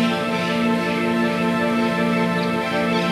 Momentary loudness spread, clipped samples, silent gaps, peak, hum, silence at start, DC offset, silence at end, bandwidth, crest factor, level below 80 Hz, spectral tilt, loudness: 2 LU; under 0.1%; none; -8 dBFS; none; 0 s; under 0.1%; 0 s; 14.5 kHz; 12 dB; -56 dBFS; -6 dB/octave; -20 LUFS